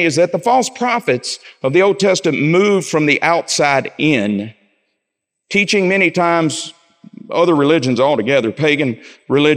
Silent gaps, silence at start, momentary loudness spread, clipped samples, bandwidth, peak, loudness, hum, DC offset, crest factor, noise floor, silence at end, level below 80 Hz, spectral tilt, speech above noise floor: none; 0 s; 8 LU; under 0.1%; 15 kHz; 0 dBFS; -15 LUFS; none; under 0.1%; 14 dB; -77 dBFS; 0 s; -66 dBFS; -4.5 dB/octave; 63 dB